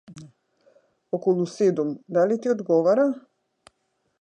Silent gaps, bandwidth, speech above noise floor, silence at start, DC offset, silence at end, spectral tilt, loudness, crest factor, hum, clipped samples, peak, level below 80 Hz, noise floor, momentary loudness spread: none; 9.8 kHz; 51 dB; 0.1 s; under 0.1%; 1 s; -7.5 dB/octave; -23 LUFS; 16 dB; none; under 0.1%; -10 dBFS; -76 dBFS; -73 dBFS; 8 LU